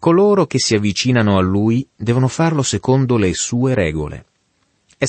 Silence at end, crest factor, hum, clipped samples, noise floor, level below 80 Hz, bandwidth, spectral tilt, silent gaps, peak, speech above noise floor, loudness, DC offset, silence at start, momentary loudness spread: 0 s; 14 dB; none; under 0.1%; -63 dBFS; -42 dBFS; 8.8 kHz; -5.5 dB/octave; none; -2 dBFS; 48 dB; -16 LUFS; under 0.1%; 0 s; 6 LU